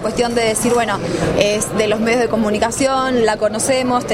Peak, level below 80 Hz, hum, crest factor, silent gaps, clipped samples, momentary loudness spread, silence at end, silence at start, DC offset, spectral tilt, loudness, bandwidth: 0 dBFS; -40 dBFS; none; 16 dB; none; under 0.1%; 2 LU; 0 s; 0 s; under 0.1%; -4 dB/octave; -16 LUFS; 16 kHz